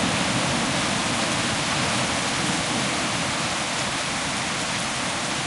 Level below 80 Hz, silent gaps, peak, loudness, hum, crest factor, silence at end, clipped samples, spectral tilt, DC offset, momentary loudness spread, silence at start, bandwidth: -50 dBFS; none; -10 dBFS; -23 LUFS; none; 14 dB; 0 s; under 0.1%; -2.5 dB/octave; under 0.1%; 2 LU; 0 s; 11.5 kHz